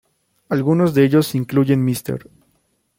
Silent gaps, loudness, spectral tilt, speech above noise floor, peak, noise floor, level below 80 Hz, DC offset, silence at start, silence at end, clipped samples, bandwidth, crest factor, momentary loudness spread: none; -17 LUFS; -7 dB/octave; 48 dB; -2 dBFS; -65 dBFS; -58 dBFS; under 0.1%; 0.5 s; 0.8 s; under 0.1%; 16.5 kHz; 16 dB; 11 LU